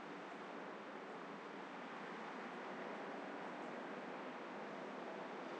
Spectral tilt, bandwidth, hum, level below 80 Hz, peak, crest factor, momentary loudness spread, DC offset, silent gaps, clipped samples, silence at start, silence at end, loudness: -5 dB/octave; 9.4 kHz; none; under -90 dBFS; -36 dBFS; 12 dB; 3 LU; under 0.1%; none; under 0.1%; 0 s; 0 s; -50 LUFS